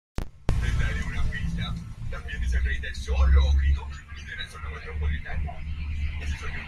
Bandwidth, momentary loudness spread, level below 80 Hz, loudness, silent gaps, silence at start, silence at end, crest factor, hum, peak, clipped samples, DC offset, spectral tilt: 10 kHz; 14 LU; -28 dBFS; -29 LUFS; none; 0.2 s; 0 s; 16 dB; none; -10 dBFS; under 0.1%; under 0.1%; -6 dB/octave